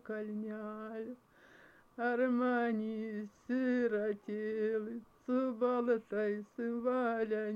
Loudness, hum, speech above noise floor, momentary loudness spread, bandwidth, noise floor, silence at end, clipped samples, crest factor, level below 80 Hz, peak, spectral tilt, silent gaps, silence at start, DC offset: -36 LUFS; none; 26 dB; 12 LU; 6.8 kHz; -62 dBFS; 0 s; under 0.1%; 14 dB; -78 dBFS; -22 dBFS; -8 dB/octave; none; 0.05 s; under 0.1%